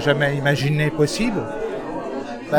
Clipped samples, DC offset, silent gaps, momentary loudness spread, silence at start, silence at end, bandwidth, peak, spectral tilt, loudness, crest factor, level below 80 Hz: under 0.1%; under 0.1%; none; 9 LU; 0 s; 0 s; 17 kHz; -4 dBFS; -5.5 dB/octave; -22 LUFS; 18 dB; -44 dBFS